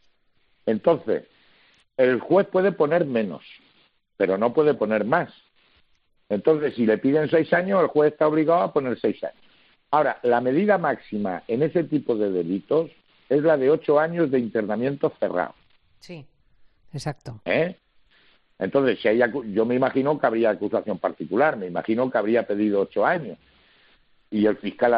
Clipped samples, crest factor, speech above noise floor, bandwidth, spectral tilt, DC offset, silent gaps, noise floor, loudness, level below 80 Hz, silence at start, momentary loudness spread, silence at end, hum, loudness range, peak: under 0.1%; 18 dB; 42 dB; 5.8 kHz; -5.5 dB/octave; under 0.1%; none; -64 dBFS; -23 LUFS; -66 dBFS; 0.65 s; 11 LU; 0 s; none; 5 LU; -4 dBFS